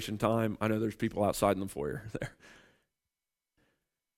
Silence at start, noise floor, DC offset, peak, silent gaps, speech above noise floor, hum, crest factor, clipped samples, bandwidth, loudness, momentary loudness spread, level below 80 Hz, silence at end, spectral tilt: 0 s; under -90 dBFS; under 0.1%; -12 dBFS; none; over 58 dB; none; 22 dB; under 0.1%; 16 kHz; -32 LUFS; 12 LU; -58 dBFS; 1.65 s; -6 dB/octave